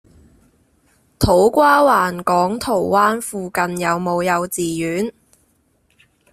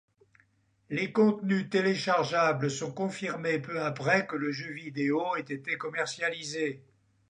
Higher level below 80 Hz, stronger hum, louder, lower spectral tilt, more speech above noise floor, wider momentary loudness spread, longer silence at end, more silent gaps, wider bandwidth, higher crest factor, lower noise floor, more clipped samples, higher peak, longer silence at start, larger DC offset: first, -42 dBFS vs -76 dBFS; neither; first, -17 LUFS vs -30 LUFS; about the same, -5 dB/octave vs -5 dB/octave; first, 44 dB vs 38 dB; about the same, 10 LU vs 8 LU; first, 1.2 s vs 0.5 s; neither; first, 16 kHz vs 10 kHz; about the same, 18 dB vs 18 dB; second, -61 dBFS vs -68 dBFS; neither; first, -2 dBFS vs -12 dBFS; first, 1.2 s vs 0.9 s; neither